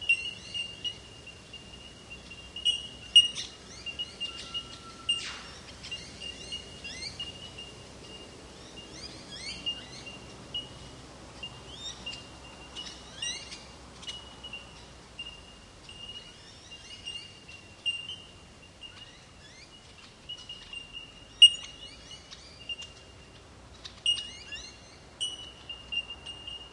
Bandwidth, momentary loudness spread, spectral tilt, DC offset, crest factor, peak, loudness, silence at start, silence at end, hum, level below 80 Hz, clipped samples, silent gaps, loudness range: 11.5 kHz; 20 LU; -0.5 dB/octave; under 0.1%; 30 dB; -6 dBFS; -30 LUFS; 0 s; 0 s; none; -58 dBFS; under 0.1%; none; 15 LU